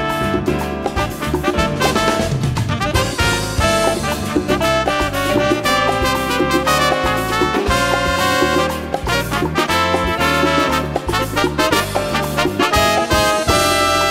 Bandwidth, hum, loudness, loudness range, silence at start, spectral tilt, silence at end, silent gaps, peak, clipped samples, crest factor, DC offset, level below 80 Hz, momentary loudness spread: 16.5 kHz; none; -16 LUFS; 1 LU; 0 s; -4 dB/octave; 0 s; none; 0 dBFS; under 0.1%; 16 dB; under 0.1%; -30 dBFS; 5 LU